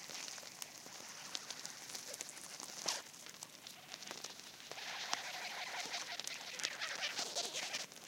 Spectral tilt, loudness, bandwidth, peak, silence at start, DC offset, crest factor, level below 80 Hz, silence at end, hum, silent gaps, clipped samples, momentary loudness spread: 0.5 dB/octave; -44 LUFS; 17 kHz; -14 dBFS; 0 s; under 0.1%; 34 dB; under -90 dBFS; 0 s; none; none; under 0.1%; 11 LU